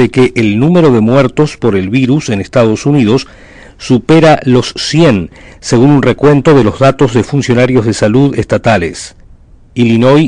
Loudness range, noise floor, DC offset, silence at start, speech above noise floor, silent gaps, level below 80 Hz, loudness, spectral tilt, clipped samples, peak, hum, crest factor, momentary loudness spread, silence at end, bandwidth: 2 LU; -38 dBFS; 0.4%; 0 s; 30 dB; none; -36 dBFS; -9 LUFS; -6.5 dB/octave; under 0.1%; 0 dBFS; none; 8 dB; 7 LU; 0 s; 10.5 kHz